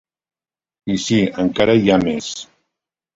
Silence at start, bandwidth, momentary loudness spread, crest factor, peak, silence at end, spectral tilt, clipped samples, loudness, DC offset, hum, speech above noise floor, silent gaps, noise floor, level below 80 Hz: 0.85 s; 8 kHz; 15 LU; 18 dB; -2 dBFS; 0.7 s; -5.5 dB/octave; under 0.1%; -17 LUFS; under 0.1%; none; 65 dB; none; -81 dBFS; -48 dBFS